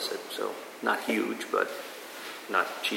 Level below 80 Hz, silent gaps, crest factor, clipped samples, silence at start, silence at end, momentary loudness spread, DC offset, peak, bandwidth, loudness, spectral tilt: under -90 dBFS; none; 22 dB; under 0.1%; 0 s; 0 s; 12 LU; under 0.1%; -10 dBFS; 16.5 kHz; -31 LUFS; -2.5 dB/octave